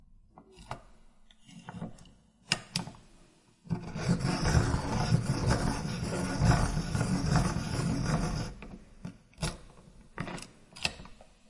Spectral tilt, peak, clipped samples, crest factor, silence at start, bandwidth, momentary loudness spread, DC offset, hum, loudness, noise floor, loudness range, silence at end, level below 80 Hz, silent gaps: -5.5 dB/octave; -10 dBFS; under 0.1%; 24 dB; 0.1 s; 11.5 kHz; 20 LU; under 0.1%; none; -32 LUFS; -61 dBFS; 10 LU; 0.25 s; -42 dBFS; none